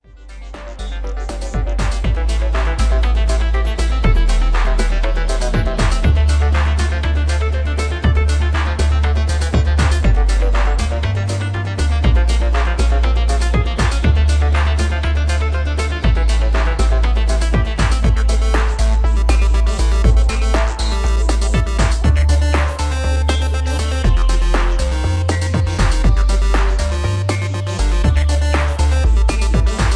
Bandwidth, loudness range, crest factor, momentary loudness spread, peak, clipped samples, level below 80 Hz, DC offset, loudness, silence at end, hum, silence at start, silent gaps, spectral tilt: 11 kHz; 1 LU; 14 dB; 4 LU; 0 dBFS; under 0.1%; -14 dBFS; under 0.1%; -17 LUFS; 0 s; none; 0.2 s; none; -5.5 dB/octave